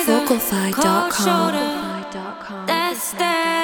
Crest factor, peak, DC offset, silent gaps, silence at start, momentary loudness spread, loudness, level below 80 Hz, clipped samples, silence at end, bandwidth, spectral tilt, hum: 16 dB; -4 dBFS; under 0.1%; none; 0 s; 11 LU; -19 LUFS; -54 dBFS; under 0.1%; 0 s; over 20 kHz; -3.5 dB/octave; none